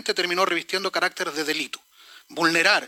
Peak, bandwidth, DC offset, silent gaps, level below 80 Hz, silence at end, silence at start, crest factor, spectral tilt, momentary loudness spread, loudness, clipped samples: -6 dBFS; 17 kHz; under 0.1%; none; -76 dBFS; 0 s; 0.05 s; 18 dB; -2 dB/octave; 12 LU; -23 LUFS; under 0.1%